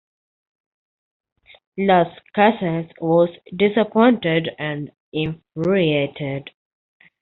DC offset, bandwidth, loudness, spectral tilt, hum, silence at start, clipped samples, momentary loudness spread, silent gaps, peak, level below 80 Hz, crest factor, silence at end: under 0.1%; 4.3 kHz; -20 LUFS; -5 dB/octave; none; 1.75 s; under 0.1%; 12 LU; 5.00-5.12 s; -2 dBFS; -60 dBFS; 20 dB; 0.75 s